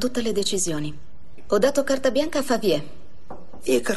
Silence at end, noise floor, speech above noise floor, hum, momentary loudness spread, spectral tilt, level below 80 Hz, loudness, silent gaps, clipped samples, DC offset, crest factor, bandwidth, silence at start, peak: 0 s; -44 dBFS; 21 dB; none; 22 LU; -3.5 dB/octave; -50 dBFS; -23 LUFS; none; under 0.1%; 4%; 18 dB; 12.5 kHz; 0 s; -6 dBFS